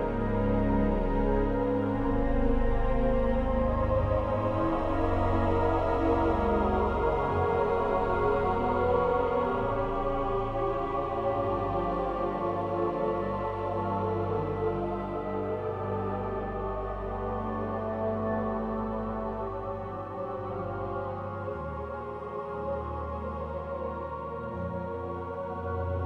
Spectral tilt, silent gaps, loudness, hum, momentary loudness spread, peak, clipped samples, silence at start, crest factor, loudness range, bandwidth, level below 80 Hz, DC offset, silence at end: -9.5 dB/octave; none; -30 LUFS; none; 9 LU; -14 dBFS; under 0.1%; 0 s; 16 dB; 8 LU; 6.4 kHz; -36 dBFS; under 0.1%; 0 s